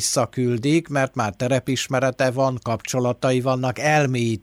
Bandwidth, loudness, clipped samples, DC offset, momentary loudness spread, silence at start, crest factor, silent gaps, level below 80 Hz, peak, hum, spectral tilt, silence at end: 16 kHz; -21 LUFS; under 0.1%; under 0.1%; 4 LU; 0 s; 14 dB; none; -56 dBFS; -8 dBFS; none; -5 dB/octave; 0.05 s